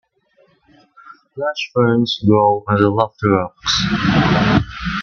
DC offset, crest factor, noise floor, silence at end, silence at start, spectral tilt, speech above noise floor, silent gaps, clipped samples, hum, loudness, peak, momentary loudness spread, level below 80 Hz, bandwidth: under 0.1%; 16 dB; -57 dBFS; 0 s; 1.05 s; -6 dB/octave; 41 dB; none; under 0.1%; none; -16 LUFS; 0 dBFS; 9 LU; -38 dBFS; 7.2 kHz